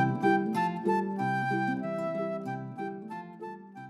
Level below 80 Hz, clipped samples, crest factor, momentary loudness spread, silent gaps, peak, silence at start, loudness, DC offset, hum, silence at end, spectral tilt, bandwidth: -72 dBFS; under 0.1%; 18 dB; 15 LU; none; -12 dBFS; 0 s; -31 LUFS; under 0.1%; none; 0 s; -7.5 dB/octave; 12.5 kHz